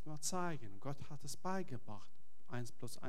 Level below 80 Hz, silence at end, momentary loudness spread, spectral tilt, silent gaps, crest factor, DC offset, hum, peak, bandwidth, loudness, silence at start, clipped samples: -74 dBFS; 0 s; 10 LU; -4.5 dB/octave; none; 20 dB; 1%; none; -24 dBFS; 17 kHz; -46 LUFS; 0.05 s; under 0.1%